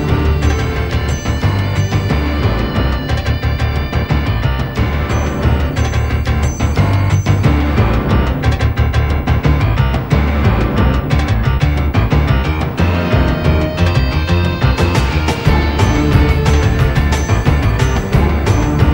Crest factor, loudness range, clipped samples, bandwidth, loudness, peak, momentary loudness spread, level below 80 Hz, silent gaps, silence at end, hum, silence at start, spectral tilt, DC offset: 12 dB; 3 LU; under 0.1%; 16.5 kHz; -15 LUFS; 0 dBFS; 4 LU; -18 dBFS; none; 0 s; none; 0 s; -6.5 dB/octave; 0.4%